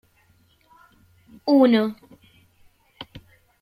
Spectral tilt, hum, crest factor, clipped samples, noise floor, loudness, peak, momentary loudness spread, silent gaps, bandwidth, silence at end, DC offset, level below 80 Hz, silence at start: -7 dB/octave; none; 20 dB; under 0.1%; -60 dBFS; -19 LUFS; -4 dBFS; 26 LU; none; 15.5 kHz; 0.45 s; under 0.1%; -64 dBFS; 1.45 s